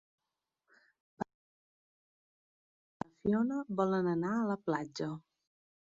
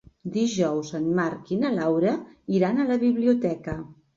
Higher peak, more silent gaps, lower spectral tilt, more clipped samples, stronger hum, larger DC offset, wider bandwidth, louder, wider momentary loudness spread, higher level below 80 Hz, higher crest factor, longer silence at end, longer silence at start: second, -18 dBFS vs -10 dBFS; first, 1.34-3.00 s vs none; about the same, -6.5 dB/octave vs -6.5 dB/octave; neither; neither; neither; about the same, 7.6 kHz vs 7.6 kHz; second, -35 LUFS vs -25 LUFS; first, 14 LU vs 10 LU; second, -72 dBFS vs -58 dBFS; about the same, 20 dB vs 16 dB; first, 0.65 s vs 0.25 s; first, 1.2 s vs 0.25 s